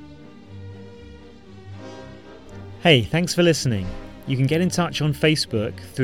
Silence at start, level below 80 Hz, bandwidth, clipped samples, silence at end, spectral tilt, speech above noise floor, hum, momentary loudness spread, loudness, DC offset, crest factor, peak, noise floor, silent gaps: 0 s; -46 dBFS; 16.5 kHz; under 0.1%; 0 s; -5 dB/octave; 24 dB; none; 24 LU; -20 LUFS; 0.3%; 22 dB; -2 dBFS; -44 dBFS; none